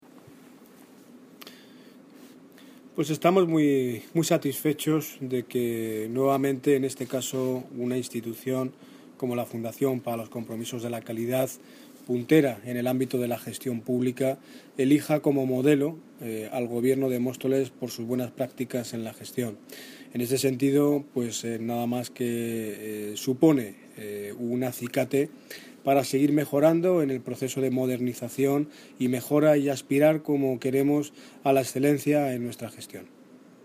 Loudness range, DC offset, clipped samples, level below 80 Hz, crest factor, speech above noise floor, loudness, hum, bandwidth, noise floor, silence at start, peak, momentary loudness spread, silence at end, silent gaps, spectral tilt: 6 LU; under 0.1%; under 0.1%; -74 dBFS; 20 dB; 25 dB; -27 LUFS; none; 15.5 kHz; -52 dBFS; 0.15 s; -8 dBFS; 13 LU; 0.25 s; none; -6 dB/octave